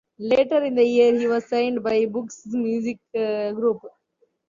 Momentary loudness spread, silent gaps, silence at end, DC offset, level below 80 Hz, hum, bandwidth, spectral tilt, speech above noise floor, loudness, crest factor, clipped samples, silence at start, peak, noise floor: 10 LU; none; 0.6 s; under 0.1%; -66 dBFS; none; 7.4 kHz; -5.5 dB/octave; 46 dB; -22 LUFS; 16 dB; under 0.1%; 0.2 s; -6 dBFS; -67 dBFS